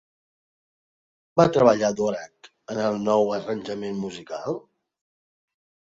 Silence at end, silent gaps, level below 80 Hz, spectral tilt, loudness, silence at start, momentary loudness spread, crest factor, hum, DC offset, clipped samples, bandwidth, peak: 1.35 s; none; -62 dBFS; -6 dB/octave; -24 LUFS; 1.35 s; 15 LU; 22 dB; none; under 0.1%; under 0.1%; 7.8 kHz; -4 dBFS